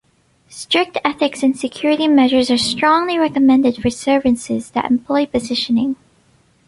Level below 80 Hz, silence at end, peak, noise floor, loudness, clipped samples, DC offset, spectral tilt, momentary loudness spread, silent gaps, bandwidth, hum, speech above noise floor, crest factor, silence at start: -48 dBFS; 0.75 s; 0 dBFS; -55 dBFS; -16 LUFS; under 0.1%; under 0.1%; -4 dB/octave; 7 LU; none; 11.5 kHz; none; 39 dB; 16 dB; 0.5 s